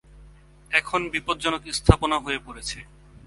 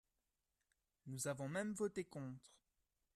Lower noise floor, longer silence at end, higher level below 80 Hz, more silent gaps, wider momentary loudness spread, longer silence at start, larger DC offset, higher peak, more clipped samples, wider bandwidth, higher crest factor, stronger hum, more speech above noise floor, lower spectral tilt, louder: second, -50 dBFS vs -90 dBFS; second, 0.1 s vs 0.7 s; first, -36 dBFS vs -80 dBFS; neither; about the same, 13 LU vs 13 LU; second, 0.15 s vs 1.05 s; neither; first, 0 dBFS vs -30 dBFS; neither; second, 11.5 kHz vs 14 kHz; first, 26 dB vs 18 dB; first, 50 Hz at -45 dBFS vs none; second, 26 dB vs 44 dB; about the same, -4.5 dB/octave vs -5 dB/octave; first, -24 LUFS vs -46 LUFS